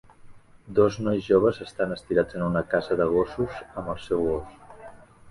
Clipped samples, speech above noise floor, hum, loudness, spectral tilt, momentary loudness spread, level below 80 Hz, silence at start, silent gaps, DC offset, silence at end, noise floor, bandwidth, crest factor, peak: under 0.1%; 23 dB; none; -25 LUFS; -7.5 dB/octave; 12 LU; -50 dBFS; 0.25 s; none; under 0.1%; 0 s; -47 dBFS; 11 kHz; 20 dB; -6 dBFS